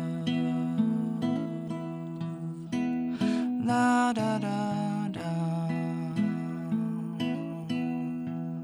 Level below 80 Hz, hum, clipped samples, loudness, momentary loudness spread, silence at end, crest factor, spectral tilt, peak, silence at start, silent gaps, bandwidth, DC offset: -70 dBFS; none; under 0.1%; -30 LUFS; 9 LU; 0 s; 14 dB; -7 dB/octave; -16 dBFS; 0 s; none; 11.5 kHz; under 0.1%